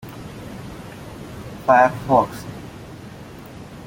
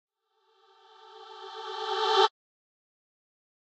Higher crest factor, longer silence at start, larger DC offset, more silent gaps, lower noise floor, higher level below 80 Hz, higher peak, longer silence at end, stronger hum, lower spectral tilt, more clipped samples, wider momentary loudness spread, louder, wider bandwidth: about the same, 22 dB vs 26 dB; second, 0.05 s vs 1.05 s; neither; neither; second, -38 dBFS vs -71 dBFS; first, -48 dBFS vs under -90 dBFS; first, -2 dBFS vs -8 dBFS; second, 0.05 s vs 1.4 s; neither; first, -6.5 dB/octave vs 1 dB/octave; neither; about the same, 23 LU vs 23 LU; first, -18 LUFS vs -27 LUFS; first, 17 kHz vs 8.6 kHz